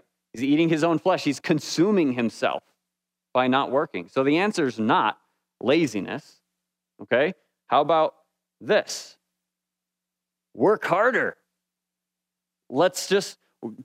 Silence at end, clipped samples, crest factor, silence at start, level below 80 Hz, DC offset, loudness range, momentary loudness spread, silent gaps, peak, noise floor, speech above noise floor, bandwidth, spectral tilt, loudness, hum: 0 s; under 0.1%; 18 dB; 0.35 s; -78 dBFS; under 0.1%; 3 LU; 13 LU; none; -6 dBFS; -86 dBFS; 64 dB; 15.5 kHz; -5 dB/octave; -23 LUFS; none